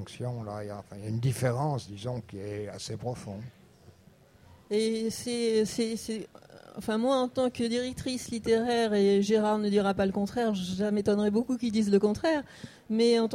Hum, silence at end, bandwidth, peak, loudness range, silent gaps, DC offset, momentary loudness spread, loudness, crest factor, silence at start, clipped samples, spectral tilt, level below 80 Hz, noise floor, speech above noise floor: none; 0 s; 15.5 kHz; -12 dBFS; 8 LU; none; under 0.1%; 14 LU; -29 LUFS; 18 dB; 0 s; under 0.1%; -6 dB/octave; -60 dBFS; -58 dBFS; 30 dB